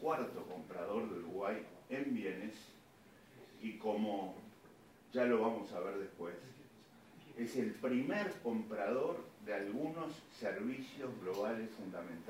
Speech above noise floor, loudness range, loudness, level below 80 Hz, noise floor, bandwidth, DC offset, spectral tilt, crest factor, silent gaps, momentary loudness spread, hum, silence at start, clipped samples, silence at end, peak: 23 dB; 4 LU; -41 LUFS; -82 dBFS; -63 dBFS; 16 kHz; under 0.1%; -6 dB/octave; 18 dB; none; 18 LU; none; 0 s; under 0.1%; 0 s; -22 dBFS